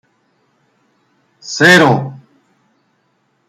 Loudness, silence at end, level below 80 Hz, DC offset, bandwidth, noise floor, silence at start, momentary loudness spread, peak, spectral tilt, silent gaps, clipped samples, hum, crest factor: -10 LUFS; 1.3 s; -58 dBFS; under 0.1%; 16 kHz; -62 dBFS; 1.45 s; 22 LU; 0 dBFS; -4.5 dB/octave; none; under 0.1%; none; 16 dB